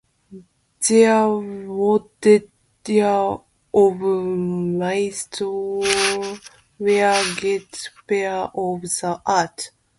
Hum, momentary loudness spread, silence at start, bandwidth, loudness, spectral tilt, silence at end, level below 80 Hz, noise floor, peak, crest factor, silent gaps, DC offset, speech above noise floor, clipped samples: none; 10 LU; 0.3 s; 11.5 kHz; -20 LUFS; -4 dB/octave; 0.3 s; -60 dBFS; -44 dBFS; -2 dBFS; 18 dB; none; under 0.1%; 25 dB; under 0.1%